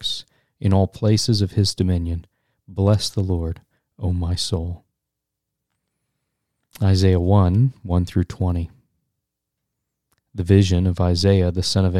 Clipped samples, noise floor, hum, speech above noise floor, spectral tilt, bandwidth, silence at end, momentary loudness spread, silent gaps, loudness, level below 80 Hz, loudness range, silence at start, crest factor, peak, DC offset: under 0.1%; -82 dBFS; none; 63 dB; -6.5 dB/octave; 12 kHz; 0 s; 13 LU; none; -20 LUFS; -38 dBFS; 6 LU; 0 s; 20 dB; -2 dBFS; under 0.1%